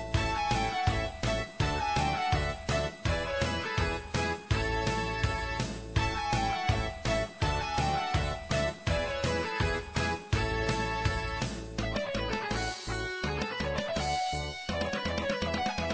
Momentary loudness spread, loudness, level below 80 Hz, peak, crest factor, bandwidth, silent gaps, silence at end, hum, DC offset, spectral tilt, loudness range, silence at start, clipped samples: 4 LU; -31 LUFS; -40 dBFS; -14 dBFS; 16 dB; 8 kHz; none; 0 s; none; under 0.1%; -5 dB/octave; 2 LU; 0 s; under 0.1%